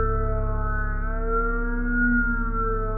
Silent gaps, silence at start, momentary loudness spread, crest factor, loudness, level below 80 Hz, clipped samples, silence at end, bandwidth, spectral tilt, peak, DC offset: none; 0 s; 6 LU; 12 dB; -26 LUFS; -26 dBFS; under 0.1%; 0 s; 2.3 kHz; -10.5 dB/octave; -12 dBFS; under 0.1%